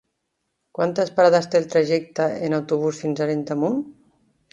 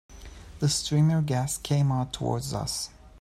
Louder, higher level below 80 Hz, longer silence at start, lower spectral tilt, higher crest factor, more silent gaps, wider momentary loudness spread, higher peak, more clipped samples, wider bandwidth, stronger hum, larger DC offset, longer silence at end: first, -21 LUFS vs -27 LUFS; second, -68 dBFS vs -48 dBFS; first, 0.8 s vs 0.1 s; about the same, -6 dB/octave vs -5 dB/octave; first, 20 dB vs 14 dB; neither; second, 8 LU vs 11 LU; first, -2 dBFS vs -12 dBFS; neither; second, 10 kHz vs 14 kHz; neither; neither; first, 0.6 s vs 0 s